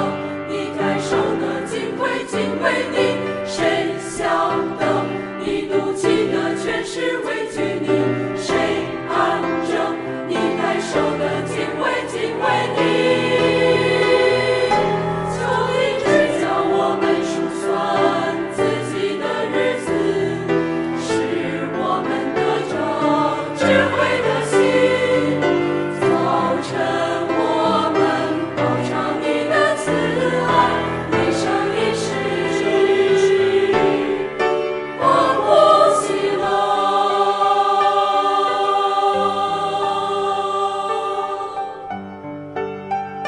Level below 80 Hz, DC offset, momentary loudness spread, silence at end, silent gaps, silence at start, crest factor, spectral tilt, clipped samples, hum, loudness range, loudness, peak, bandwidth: -50 dBFS; under 0.1%; 7 LU; 0 s; none; 0 s; 18 dB; -5 dB/octave; under 0.1%; none; 4 LU; -19 LUFS; -2 dBFS; 11.5 kHz